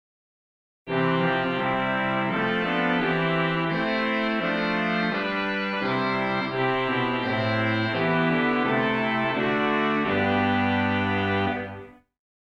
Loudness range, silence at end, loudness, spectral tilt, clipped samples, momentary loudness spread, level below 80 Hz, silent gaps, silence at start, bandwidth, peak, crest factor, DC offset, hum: 2 LU; 0.7 s; -24 LUFS; -7.5 dB/octave; under 0.1%; 3 LU; -54 dBFS; none; 0.85 s; 8.2 kHz; -10 dBFS; 14 dB; under 0.1%; none